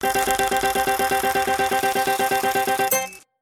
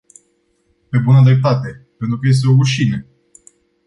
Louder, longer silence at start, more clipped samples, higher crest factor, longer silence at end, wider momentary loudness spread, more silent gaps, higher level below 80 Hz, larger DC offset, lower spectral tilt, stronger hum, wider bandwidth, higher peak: second, -21 LUFS vs -14 LUFS; second, 0 s vs 0.95 s; neither; first, 20 dB vs 14 dB; second, 0.25 s vs 0.85 s; second, 1 LU vs 15 LU; neither; about the same, -48 dBFS vs -50 dBFS; neither; second, -2 dB/octave vs -7 dB/octave; neither; first, 17 kHz vs 11 kHz; about the same, 0 dBFS vs -2 dBFS